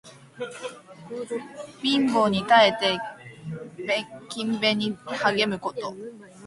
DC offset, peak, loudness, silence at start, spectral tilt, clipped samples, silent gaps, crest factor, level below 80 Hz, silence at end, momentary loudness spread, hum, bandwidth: under 0.1%; -2 dBFS; -24 LUFS; 0.05 s; -4.5 dB/octave; under 0.1%; none; 22 dB; -64 dBFS; 0 s; 20 LU; none; 11.5 kHz